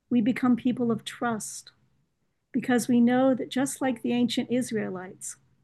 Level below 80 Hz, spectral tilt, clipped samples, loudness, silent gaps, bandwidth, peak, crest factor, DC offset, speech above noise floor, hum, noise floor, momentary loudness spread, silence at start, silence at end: -72 dBFS; -4.5 dB/octave; under 0.1%; -26 LUFS; none; 12.5 kHz; -12 dBFS; 16 dB; under 0.1%; 50 dB; none; -76 dBFS; 15 LU; 0.1 s; 0.3 s